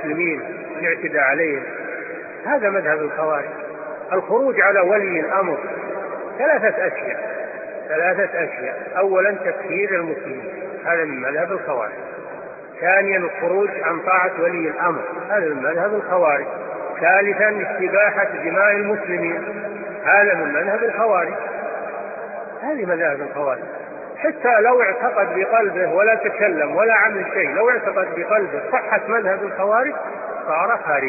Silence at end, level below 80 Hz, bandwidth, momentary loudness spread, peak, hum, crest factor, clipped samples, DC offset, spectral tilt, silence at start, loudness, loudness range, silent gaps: 0 s; -72 dBFS; 2.7 kHz; 13 LU; -2 dBFS; none; 18 dB; under 0.1%; under 0.1%; 2 dB/octave; 0 s; -19 LUFS; 4 LU; none